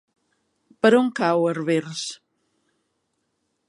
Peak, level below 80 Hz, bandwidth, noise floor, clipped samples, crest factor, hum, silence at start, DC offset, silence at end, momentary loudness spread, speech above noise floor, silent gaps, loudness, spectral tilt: -4 dBFS; -76 dBFS; 11.5 kHz; -74 dBFS; under 0.1%; 20 dB; none; 0.85 s; under 0.1%; 1.55 s; 13 LU; 53 dB; none; -21 LUFS; -5 dB/octave